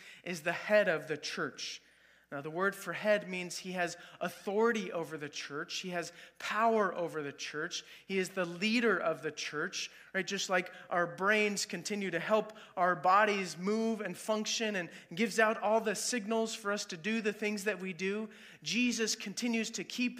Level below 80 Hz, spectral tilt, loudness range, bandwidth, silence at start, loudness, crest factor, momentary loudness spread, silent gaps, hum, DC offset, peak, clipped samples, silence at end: -84 dBFS; -3.5 dB/octave; 4 LU; 15.5 kHz; 0 s; -34 LUFS; 22 dB; 11 LU; none; none; under 0.1%; -12 dBFS; under 0.1%; 0 s